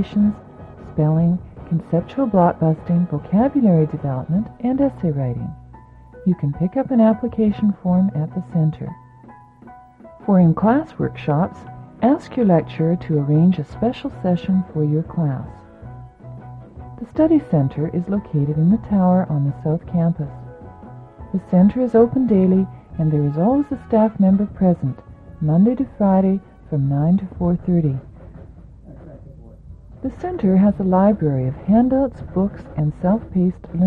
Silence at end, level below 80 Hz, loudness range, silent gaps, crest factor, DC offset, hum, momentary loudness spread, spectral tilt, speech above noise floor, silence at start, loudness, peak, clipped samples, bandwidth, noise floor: 0 s; -44 dBFS; 4 LU; none; 16 dB; under 0.1%; none; 14 LU; -11.5 dB/octave; 27 dB; 0 s; -19 LUFS; -4 dBFS; under 0.1%; 4.4 kHz; -44 dBFS